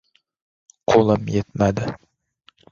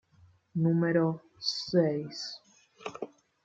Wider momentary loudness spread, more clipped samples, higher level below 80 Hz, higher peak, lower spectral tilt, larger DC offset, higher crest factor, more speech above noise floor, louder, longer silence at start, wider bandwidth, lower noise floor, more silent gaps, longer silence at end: second, 14 LU vs 17 LU; neither; first, -46 dBFS vs -72 dBFS; first, -2 dBFS vs -12 dBFS; about the same, -7 dB/octave vs -6.5 dB/octave; neither; about the same, 20 dB vs 20 dB; first, 39 dB vs 34 dB; first, -20 LUFS vs -30 LUFS; first, 0.9 s vs 0.55 s; about the same, 7.6 kHz vs 7.6 kHz; second, -58 dBFS vs -62 dBFS; neither; first, 0.75 s vs 0.4 s